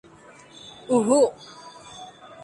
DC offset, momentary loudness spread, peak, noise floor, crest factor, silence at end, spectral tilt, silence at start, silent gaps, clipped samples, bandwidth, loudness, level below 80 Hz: under 0.1%; 23 LU; -6 dBFS; -49 dBFS; 20 dB; 0 s; -4.5 dB/octave; 0.65 s; none; under 0.1%; 11.5 kHz; -21 LUFS; -68 dBFS